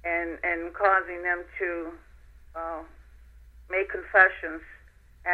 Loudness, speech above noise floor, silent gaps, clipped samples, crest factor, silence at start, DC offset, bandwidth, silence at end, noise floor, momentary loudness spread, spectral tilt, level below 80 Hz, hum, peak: -26 LUFS; 24 dB; none; under 0.1%; 24 dB; 0.05 s; under 0.1%; 6.4 kHz; 0 s; -51 dBFS; 19 LU; -6.5 dB/octave; -52 dBFS; 60 Hz at -75 dBFS; -4 dBFS